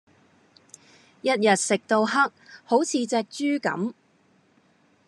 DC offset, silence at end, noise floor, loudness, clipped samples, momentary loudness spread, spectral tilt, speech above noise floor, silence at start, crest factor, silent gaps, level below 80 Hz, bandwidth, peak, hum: under 0.1%; 1.15 s; -62 dBFS; -24 LUFS; under 0.1%; 8 LU; -3.5 dB/octave; 39 dB; 1.25 s; 20 dB; none; -86 dBFS; 12 kHz; -6 dBFS; none